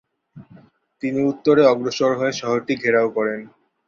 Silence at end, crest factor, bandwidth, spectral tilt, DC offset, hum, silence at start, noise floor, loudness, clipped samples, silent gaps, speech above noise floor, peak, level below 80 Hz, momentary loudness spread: 0.4 s; 18 dB; 7.4 kHz; -5.5 dB/octave; under 0.1%; none; 0.35 s; -50 dBFS; -19 LUFS; under 0.1%; none; 31 dB; -2 dBFS; -64 dBFS; 10 LU